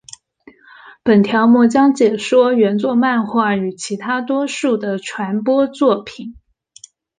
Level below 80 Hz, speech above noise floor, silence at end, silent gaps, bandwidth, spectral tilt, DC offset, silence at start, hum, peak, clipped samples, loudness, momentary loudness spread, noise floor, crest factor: -58 dBFS; 33 dB; 0.85 s; none; 9.6 kHz; -5.5 dB/octave; under 0.1%; 0.85 s; none; -2 dBFS; under 0.1%; -15 LUFS; 11 LU; -47 dBFS; 14 dB